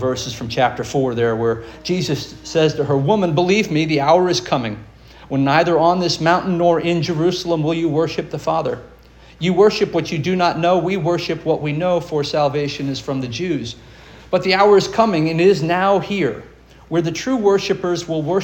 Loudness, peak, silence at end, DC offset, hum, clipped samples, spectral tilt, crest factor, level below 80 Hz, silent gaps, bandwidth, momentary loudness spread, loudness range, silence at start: -18 LUFS; 0 dBFS; 0 s; under 0.1%; none; under 0.1%; -5.5 dB/octave; 16 dB; -48 dBFS; none; 17 kHz; 9 LU; 3 LU; 0 s